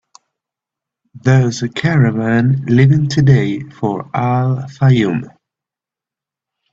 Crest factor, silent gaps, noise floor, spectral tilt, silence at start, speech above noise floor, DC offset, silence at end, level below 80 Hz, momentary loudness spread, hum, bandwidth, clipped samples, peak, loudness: 14 dB; none; -87 dBFS; -7.5 dB/octave; 1.15 s; 74 dB; under 0.1%; 1.45 s; -48 dBFS; 9 LU; none; 7.6 kHz; under 0.1%; 0 dBFS; -14 LUFS